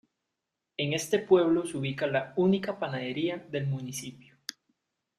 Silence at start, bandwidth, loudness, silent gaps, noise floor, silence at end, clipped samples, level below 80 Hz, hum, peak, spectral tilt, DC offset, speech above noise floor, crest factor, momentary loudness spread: 0.8 s; 15 kHz; -29 LUFS; none; -85 dBFS; 1.05 s; under 0.1%; -70 dBFS; none; -10 dBFS; -5.5 dB/octave; under 0.1%; 57 dB; 20 dB; 19 LU